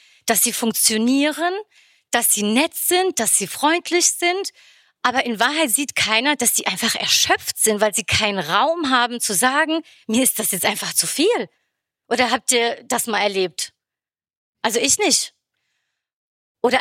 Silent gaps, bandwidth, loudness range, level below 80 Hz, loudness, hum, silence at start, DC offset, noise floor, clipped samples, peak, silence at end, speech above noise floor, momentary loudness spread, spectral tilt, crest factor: 14.37-14.53 s, 16.13-16.55 s; 17 kHz; 4 LU; -58 dBFS; -18 LUFS; none; 0.25 s; under 0.1%; under -90 dBFS; under 0.1%; 0 dBFS; 0 s; over 71 dB; 8 LU; -1.5 dB/octave; 20 dB